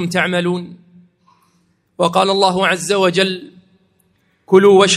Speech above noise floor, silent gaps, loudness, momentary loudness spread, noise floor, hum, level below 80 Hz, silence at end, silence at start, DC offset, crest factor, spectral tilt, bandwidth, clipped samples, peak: 46 dB; none; -14 LUFS; 12 LU; -60 dBFS; none; -60 dBFS; 0 s; 0 s; under 0.1%; 16 dB; -4 dB/octave; 13 kHz; under 0.1%; 0 dBFS